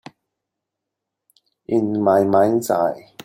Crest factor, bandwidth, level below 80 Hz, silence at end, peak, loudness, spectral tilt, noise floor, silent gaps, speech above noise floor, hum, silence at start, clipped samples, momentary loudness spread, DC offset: 18 dB; 16.5 kHz; -64 dBFS; 0.25 s; -4 dBFS; -18 LUFS; -6.5 dB/octave; -82 dBFS; none; 65 dB; none; 1.7 s; under 0.1%; 7 LU; under 0.1%